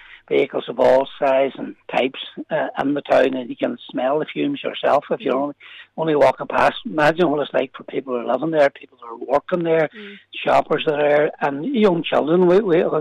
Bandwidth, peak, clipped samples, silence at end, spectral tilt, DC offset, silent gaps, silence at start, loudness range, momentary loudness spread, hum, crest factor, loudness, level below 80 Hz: 11 kHz; -6 dBFS; under 0.1%; 0 s; -6.5 dB/octave; under 0.1%; none; 0.1 s; 3 LU; 10 LU; none; 12 dB; -19 LUFS; -58 dBFS